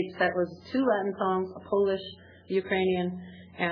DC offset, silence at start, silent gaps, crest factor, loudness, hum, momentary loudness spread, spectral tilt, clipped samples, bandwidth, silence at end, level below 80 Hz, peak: under 0.1%; 0 s; none; 18 dB; -29 LUFS; none; 8 LU; -8.5 dB/octave; under 0.1%; 5.4 kHz; 0 s; -66 dBFS; -12 dBFS